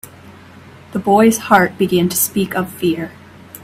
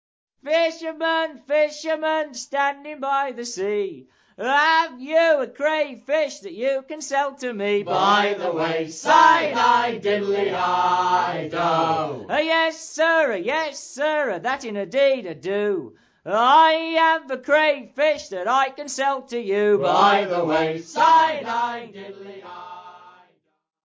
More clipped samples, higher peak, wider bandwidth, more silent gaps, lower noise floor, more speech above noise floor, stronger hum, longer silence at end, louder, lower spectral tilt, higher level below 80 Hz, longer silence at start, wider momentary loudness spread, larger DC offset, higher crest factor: neither; about the same, 0 dBFS vs -2 dBFS; first, 16 kHz vs 8 kHz; neither; second, -40 dBFS vs -62 dBFS; second, 25 dB vs 41 dB; neither; second, 0.05 s vs 0.75 s; first, -15 LUFS vs -21 LUFS; about the same, -4.5 dB/octave vs -3.5 dB/octave; first, -52 dBFS vs -68 dBFS; first, 0.9 s vs 0.45 s; about the same, 12 LU vs 11 LU; neither; about the same, 16 dB vs 18 dB